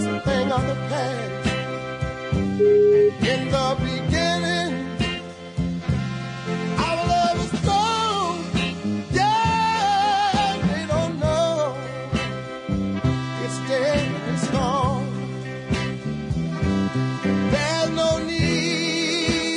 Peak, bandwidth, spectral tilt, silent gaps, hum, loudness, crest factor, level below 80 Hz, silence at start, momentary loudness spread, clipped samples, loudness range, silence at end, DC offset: -8 dBFS; 11 kHz; -5.5 dB/octave; none; none; -22 LUFS; 14 dB; -42 dBFS; 0 s; 8 LU; under 0.1%; 4 LU; 0 s; under 0.1%